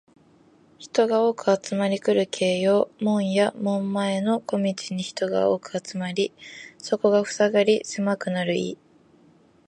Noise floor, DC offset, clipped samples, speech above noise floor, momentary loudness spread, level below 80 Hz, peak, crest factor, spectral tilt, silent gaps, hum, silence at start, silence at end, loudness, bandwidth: -57 dBFS; under 0.1%; under 0.1%; 33 dB; 9 LU; -72 dBFS; -6 dBFS; 18 dB; -5 dB/octave; none; none; 0.8 s; 0.95 s; -24 LUFS; 10 kHz